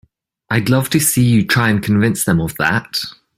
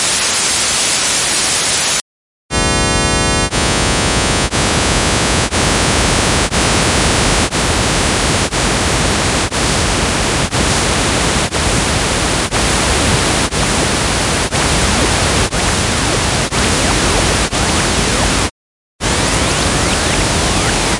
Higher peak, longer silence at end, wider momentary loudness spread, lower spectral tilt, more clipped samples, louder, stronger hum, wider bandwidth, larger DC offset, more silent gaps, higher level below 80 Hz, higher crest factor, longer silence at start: about the same, -2 dBFS vs 0 dBFS; first, 0.25 s vs 0 s; first, 6 LU vs 2 LU; first, -4.5 dB/octave vs -3 dB/octave; neither; about the same, -15 LUFS vs -13 LUFS; neither; first, 16 kHz vs 12 kHz; neither; second, none vs 2.01-2.49 s, 18.51-18.99 s; second, -44 dBFS vs -24 dBFS; about the same, 14 dB vs 14 dB; first, 0.5 s vs 0 s